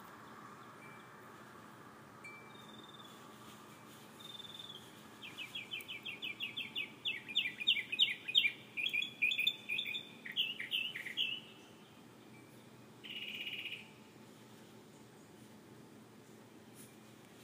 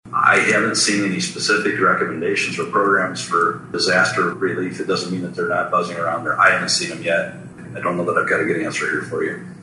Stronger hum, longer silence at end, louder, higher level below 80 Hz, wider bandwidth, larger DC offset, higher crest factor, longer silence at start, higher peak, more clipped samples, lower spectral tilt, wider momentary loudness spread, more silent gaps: neither; about the same, 0 s vs 0 s; second, -37 LUFS vs -18 LUFS; second, -86 dBFS vs -60 dBFS; first, 15.5 kHz vs 11.5 kHz; neither; first, 28 dB vs 18 dB; about the same, 0 s vs 0.05 s; second, -16 dBFS vs -2 dBFS; neither; second, -1.5 dB/octave vs -3.5 dB/octave; first, 25 LU vs 9 LU; neither